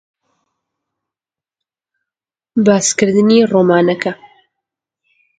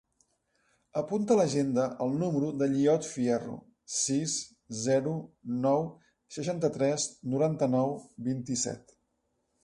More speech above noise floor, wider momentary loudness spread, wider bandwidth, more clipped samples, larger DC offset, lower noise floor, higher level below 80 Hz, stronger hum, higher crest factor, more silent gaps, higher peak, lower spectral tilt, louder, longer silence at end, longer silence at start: first, 77 dB vs 48 dB; about the same, 11 LU vs 11 LU; second, 9.4 kHz vs 11.5 kHz; neither; neither; first, -89 dBFS vs -77 dBFS; first, -60 dBFS vs -68 dBFS; neither; about the same, 16 dB vs 16 dB; neither; first, 0 dBFS vs -14 dBFS; about the same, -4.5 dB/octave vs -5 dB/octave; first, -13 LUFS vs -30 LUFS; first, 1.25 s vs 0.85 s; first, 2.55 s vs 0.95 s